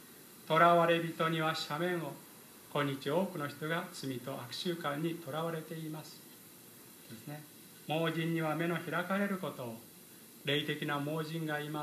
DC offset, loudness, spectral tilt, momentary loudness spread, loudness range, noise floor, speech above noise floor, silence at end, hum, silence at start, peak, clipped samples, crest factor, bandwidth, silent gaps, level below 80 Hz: under 0.1%; -34 LUFS; -5.5 dB/octave; 21 LU; 9 LU; -55 dBFS; 21 dB; 0 s; none; 0 s; -12 dBFS; under 0.1%; 24 dB; 15 kHz; none; -84 dBFS